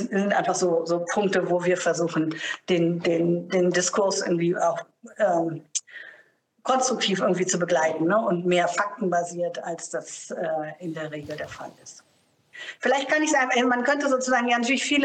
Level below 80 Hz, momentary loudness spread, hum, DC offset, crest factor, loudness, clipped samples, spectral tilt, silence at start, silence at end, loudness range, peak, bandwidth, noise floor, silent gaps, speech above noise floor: -72 dBFS; 12 LU; none; under 0.1%; 14 dB; -24 LUFS; under 0.1%; -4 dB/octave; 0 s; 0 s; 7 LU; -10 dBFS; 10 kHz; -64 dBFS; none; 40 dB